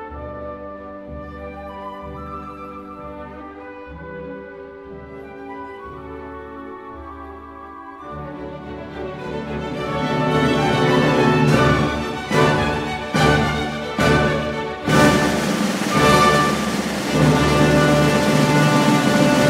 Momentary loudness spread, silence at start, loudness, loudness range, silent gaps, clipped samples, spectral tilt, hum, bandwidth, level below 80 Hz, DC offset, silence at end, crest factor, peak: 20 LU; 0 s; -17 LUFS; 18 LU; none; under 0.1%; -5.5 dB/octave; none; 16 kHz; -38 dBFS; under 0.1%; 0 s; 18 dB; -2 dBFS